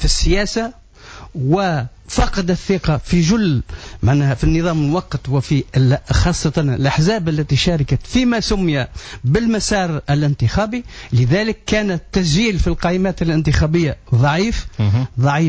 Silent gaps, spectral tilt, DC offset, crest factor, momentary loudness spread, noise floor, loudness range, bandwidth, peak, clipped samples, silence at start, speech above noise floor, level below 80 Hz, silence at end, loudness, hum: none; -6 dB/octave; under 0.1%; 12 dB; 5 LU; -38 dBFS; 1 LU; 8 kHz; -4 dBFS; under 0.1%; 0 s; 22 dB; -26 dBFS; 0 s; -17 LUFS; none